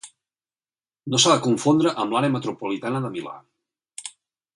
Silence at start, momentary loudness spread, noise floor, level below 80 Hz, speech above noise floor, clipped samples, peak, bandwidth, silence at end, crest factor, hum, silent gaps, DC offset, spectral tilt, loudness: 0.05 s; 21 LU; under -90 dBFS; -68 dBFS; over 68 dB; under 0.1%; -4 dBFS; 11.5 kHz; 0.45 s; 20 dB; none; none; under 0.1%; -4 dB/octave; -21 LUFS